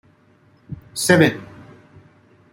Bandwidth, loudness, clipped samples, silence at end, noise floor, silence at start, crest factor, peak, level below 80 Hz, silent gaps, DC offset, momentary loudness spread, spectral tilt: 16 kHz; -17 LUFS; under 0.1%; 1.1 s; -55 dBFS; 0.7 s; 20 dB; -2 dBFS; -56 dBFS; none; under 0.1%; 24 LU; -4.5 dB/octave